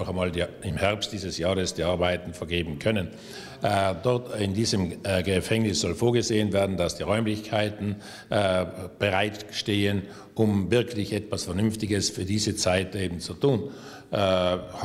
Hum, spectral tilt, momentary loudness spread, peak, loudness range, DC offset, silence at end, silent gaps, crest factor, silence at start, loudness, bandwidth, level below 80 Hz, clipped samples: none; -5 dB/octave; 7 LU; -8 dBFS; 2 LU; under 0.1%; 0 s; none; 18 dB; 0 s; -26 LUFS; 15.5 kHz; -50 dBFS; under 0.1%